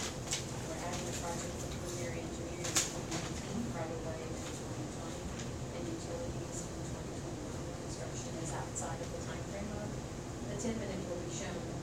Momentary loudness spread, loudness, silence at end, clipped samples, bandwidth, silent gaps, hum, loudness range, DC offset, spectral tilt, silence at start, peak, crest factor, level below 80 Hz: 5 LU; -40 LUFS; 0 s; under 0.1%; 16 kHz; none; none; 4 LU; under 0.1%; -4 dB/octave; 0 s; -14 dBFS; 26 dB; -52 dBFS